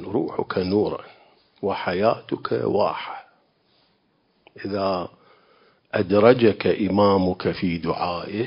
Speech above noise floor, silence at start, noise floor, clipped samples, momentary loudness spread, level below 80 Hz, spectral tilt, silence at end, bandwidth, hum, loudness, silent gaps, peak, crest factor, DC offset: 44 dB; 0 s; -66 dBFS; under 0.1%; 13 LU; -50 dBFS; -11 dB/octave; 0 s; 5.4 kHz; none; -22 LUFS; none; 0 dBFS; 22 dB; under 0.1%